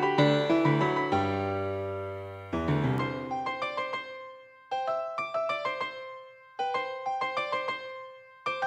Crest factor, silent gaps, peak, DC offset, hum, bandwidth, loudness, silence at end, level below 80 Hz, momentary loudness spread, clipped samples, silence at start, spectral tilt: 20 dB; none; -12 dBFS; under 0.1%; none; 9.6 kHz; -30 LUFS; 0 s; -58 dBFS; 17 LU; under 0.1%; 0 s; -7 dB/octave